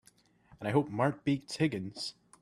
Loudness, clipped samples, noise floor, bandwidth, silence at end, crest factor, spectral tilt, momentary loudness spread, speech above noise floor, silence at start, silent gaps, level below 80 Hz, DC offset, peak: -33 LUFS; under 0.1%; -65 dBFS; 13 kHz; 0.3 s; 20 dB; -6 dB/octave; 10 LU; 33 dB; 0.5 s; none; -68 dBFS; under 0.1%; -14 dBFS